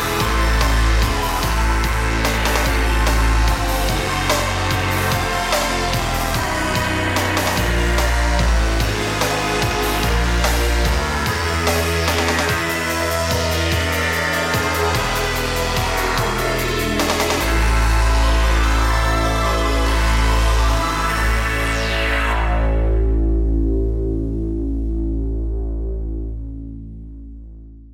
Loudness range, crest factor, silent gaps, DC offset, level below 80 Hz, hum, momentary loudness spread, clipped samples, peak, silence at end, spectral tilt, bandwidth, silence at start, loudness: 3 LU; 14 dB; none; under 0.1%; -20 dBFS; none; 6 LU; under 0.1%; -4 dBFS; 0 s; -4 dB/octave; 16.5 kHz; 0 s; -19 LUFS